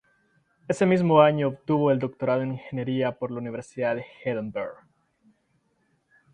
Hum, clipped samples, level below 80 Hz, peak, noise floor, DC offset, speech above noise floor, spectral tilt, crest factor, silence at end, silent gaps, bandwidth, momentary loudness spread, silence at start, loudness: none; under 0.1%; -66 dBFS; -4 dBFS; -70 dBFS; under 0.1%; 46 dB; -7.5 dB/octave; 22 dB; 1.6 s; none; 10.5 kHz; 14 LU; 0.7 s; -25 LUFS